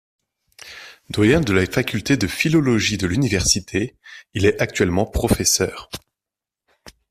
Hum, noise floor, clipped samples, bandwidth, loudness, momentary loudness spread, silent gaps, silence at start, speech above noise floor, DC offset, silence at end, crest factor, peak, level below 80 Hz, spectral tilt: none; -88 dBFS; under 0.1%; 15.5 kHz; -19 LUFS; 18 LU; none; 0.65 s; 69 dB; under 0.1%; 0.2 s; 18 dB; -2 dBFS; -38 dBFS; -4 dB/octave